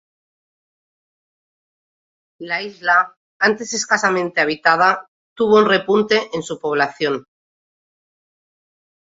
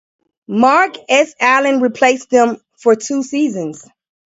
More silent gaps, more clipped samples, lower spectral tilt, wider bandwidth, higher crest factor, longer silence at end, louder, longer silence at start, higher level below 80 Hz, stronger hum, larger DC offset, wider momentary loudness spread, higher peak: first, 3.17-3.40 s, 5.08-5.36 s vs none; neither; about the same, -3.5 dB/octave vs -3.5 dB/octave; about the same, 8 kHz vs 8 kHz; first, 20 dB vs 14 dB; first, 2 s vs 0.55 s; second, -17 LUFS vs -14 LUFS; first, 2.4 s vs 0.5 s; about the same, -64 dBFS vs -64 dBFS; neither; neither; first, 11 LU vs 7 LU; about the same, -2 dBFS vs 0 dBFS